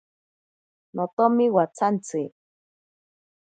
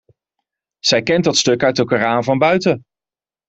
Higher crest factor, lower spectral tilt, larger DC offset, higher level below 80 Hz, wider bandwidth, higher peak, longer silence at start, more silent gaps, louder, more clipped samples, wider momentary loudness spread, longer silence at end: about the same, 20 dB vs 16 dB; first, -7 dB/octave vs -4 dB/octave; neither; second, -78 dBFS vs -54 dBFS; first, 9.2 kHz vs 8.2 kHz; second, -6 dBFS vs -2 dBFS; about the same, 0.95 s vs 0.85 s; first, 1.13-1.17 s vs none; second, -23 LUFS vs -16 LUFS; neither; first, 13 LU vs 5 LU; first, 1.15 s vs 0.7 s